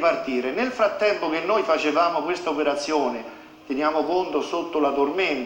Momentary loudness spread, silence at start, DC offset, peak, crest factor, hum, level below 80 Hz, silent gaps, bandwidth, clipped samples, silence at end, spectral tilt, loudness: 5 LU; 0 s; under 0.1%; -8 dBFS; 14 dB; none; -60 dBFS; none; 17 kHz; under 0.1%; 0 s; -4 dB/octave; -23 LUFS